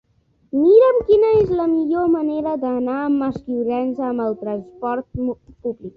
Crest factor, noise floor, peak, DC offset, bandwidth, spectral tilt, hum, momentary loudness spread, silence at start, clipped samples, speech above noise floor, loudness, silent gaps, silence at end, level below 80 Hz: 16 dB; -60 dBFS; -2 dBFS; under 0.1%; 5 kHz; -9.5 dB/octave; none; 13 LU; 0.55 s; under 0.1%; 41 dB; -19 LUFS; none; 0.05 s; -48 dBFS